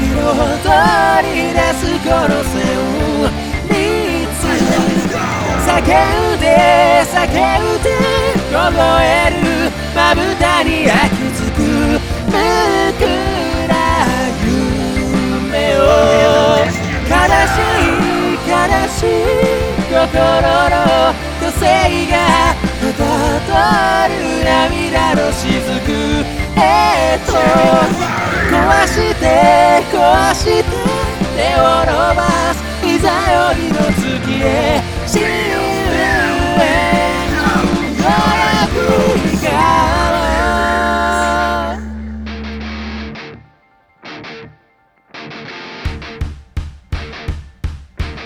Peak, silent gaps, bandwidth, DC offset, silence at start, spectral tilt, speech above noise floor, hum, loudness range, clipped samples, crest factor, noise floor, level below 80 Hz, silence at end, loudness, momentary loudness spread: 0 dBFS; none; over 20 kHz; under 0.1%; 0 s; -5 dB/octave; 42 dB; none; 7 LU; under 0.1%; 14 dB; -54 dBFS; -26 dBFS; 0 s; -13 LUFS; 14 LU